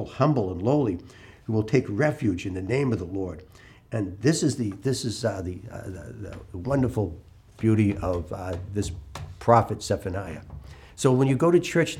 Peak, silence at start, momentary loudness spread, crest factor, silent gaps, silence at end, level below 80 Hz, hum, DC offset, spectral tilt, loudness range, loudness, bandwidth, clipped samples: -4 dBFS; 0 s; 18 LU; 22 dB; none; 0 s; -50 dBFS; none; under 0.1%; -6.5 dB/octave; 3 LU; -25 LUFS; 15 kHz; under 0.1%